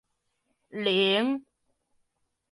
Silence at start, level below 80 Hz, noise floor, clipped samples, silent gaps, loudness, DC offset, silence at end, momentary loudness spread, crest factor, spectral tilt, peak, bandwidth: 0.75 s; -78 dBFS; -78 dBFS; under 0.1%; none; -26 LUFS; under 0.1%; 1.1 s; 13 LU; 18 dB; -5.5 dB/octave; -12 dBFS; 11.5 kHz